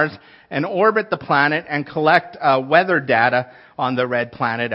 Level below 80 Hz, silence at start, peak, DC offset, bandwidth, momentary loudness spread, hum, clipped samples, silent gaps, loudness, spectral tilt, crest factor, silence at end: -64 dBFS; 0 s; 0 dBFS; under 0.1%; 5.8 kHz; 8 LU; none; under 0.1%; none; -18 LUFS; -8 dB/octave; 18 dB; 0 s